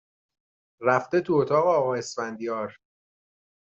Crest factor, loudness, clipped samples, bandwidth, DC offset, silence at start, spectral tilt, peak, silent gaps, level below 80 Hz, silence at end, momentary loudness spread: 20 dB; -25 LUFS; under 0.1%; 8 kHz; under 0.1%; 0.8 s; -5.5 dB/octave; -8 dBFS; none; -70 dBFS; 0.9 s; 11 LU